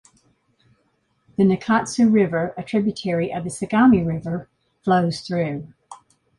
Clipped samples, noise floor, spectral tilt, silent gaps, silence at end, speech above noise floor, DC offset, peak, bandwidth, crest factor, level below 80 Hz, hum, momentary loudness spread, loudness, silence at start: under 0.1%; -67 dBFS; -6.5 dB/octave; none; 0.45 s; 47 dB; under 0.1%; -6 dBFS; 11.5 kHz; 16 dB; -54 dBFS; none; 13 LU; -21 LUFS; 1.4 s